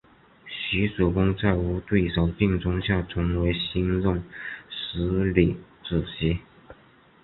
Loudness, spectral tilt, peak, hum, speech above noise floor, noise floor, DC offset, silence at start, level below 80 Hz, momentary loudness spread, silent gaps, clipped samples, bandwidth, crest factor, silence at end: -25 LUFS; -11.5 dB/octave; -4 dBFS; none; 31 dB; -56 dBFS; under 0.1%; 0.45 s; -36 dBFS; 10 LU; none; under 0.1%; 4.2 kHz; 22 dB; 0.5 s